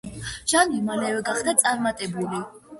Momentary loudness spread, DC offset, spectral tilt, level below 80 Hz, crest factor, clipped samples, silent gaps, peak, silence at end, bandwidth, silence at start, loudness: 10 LU; under 0.1%; -2.5 dB/octave; -52 dBFS; 22 dB; under 0.1%; none; -2 dBFS; 0 s; 12 kHz; 0.05 s; -23 LUFS